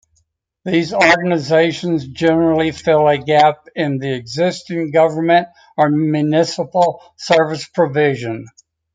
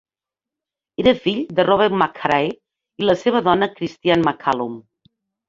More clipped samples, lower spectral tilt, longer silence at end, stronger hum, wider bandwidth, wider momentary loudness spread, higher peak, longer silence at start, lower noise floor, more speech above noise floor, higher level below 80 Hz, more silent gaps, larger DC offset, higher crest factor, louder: neither; about the same, -6 dB/octave vs -6.5 dB/octave; second, 0.45 s vs 0.7 s; neither; first, 9.4 kHz vs 7.6 kHz; about the same, 9 LU vs 10 LU; about the same, 0 dBFS vs 0 dBFS; second, 0.65 s vs 1 s; second, -64 dBFS vs -89 dBFS; second, 49 dB vs 71 dB; about the same, -56 dBFS vs -52 dBFS; neither; neither; about the same, 16 dB vs 20 dB; first, -16 LUFS vs -19 LUFS